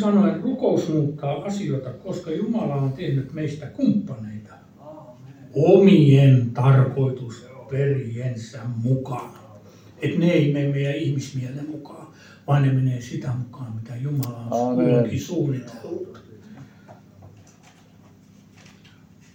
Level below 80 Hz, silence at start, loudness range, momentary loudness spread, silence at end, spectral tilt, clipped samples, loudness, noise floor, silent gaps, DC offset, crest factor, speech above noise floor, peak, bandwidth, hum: -60 dBFS; 0 s; 9 LU; 18 LU; 2.05 s; -8.5 dB/octave; under 0.1%; -22 LUFS; -51 dBFS; none; under 0.1%; 20 dB; 30 dB; -2 dBFS; 16.5 kHz; none